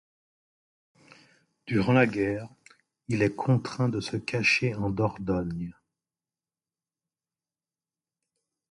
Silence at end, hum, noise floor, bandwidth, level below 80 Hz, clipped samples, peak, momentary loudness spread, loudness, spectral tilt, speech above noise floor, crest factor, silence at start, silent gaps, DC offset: 3 s; none; under -90 dBFS; 11.5 kHz; -56 dBFS; under 0.1%; -8 dBFS; 14 LU; -27 LUFS; -6.5 dB/octave; over 64 dB; 22 dB; 1.65 s; none; under 0.1%